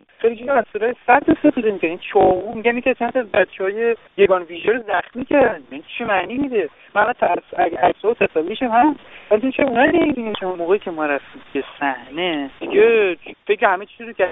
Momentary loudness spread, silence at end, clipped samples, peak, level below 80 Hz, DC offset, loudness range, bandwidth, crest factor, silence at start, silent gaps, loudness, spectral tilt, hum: 8 LU; 0 s; under 0.1%; 0 dBFS; -52 dBFS; under 0.1%; 2 LU; 4 kHz; 18 dB; 0.2 s; none; -19 LUFS; -9.5 dB/octave; none